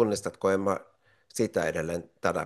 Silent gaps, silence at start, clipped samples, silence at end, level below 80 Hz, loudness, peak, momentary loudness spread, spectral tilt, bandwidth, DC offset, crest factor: none; 0 s; under 0.1%; 0 s; -64 dBFS; -30 LUFS; -10 dBFS; 8 LU; -5 dB/octave; 12.5 kHz; under 0.1%; 18 dB